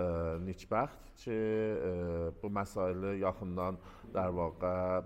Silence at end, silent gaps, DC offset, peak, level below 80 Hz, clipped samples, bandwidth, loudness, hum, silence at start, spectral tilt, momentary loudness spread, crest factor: 0 s; none; under 0.1%; -18 dBFS; -54 dBFS; under 0.1%; 15.5 kHz; -36 LUFS; none; 0 s; -8 dB/octave; 6 LU; 18 dB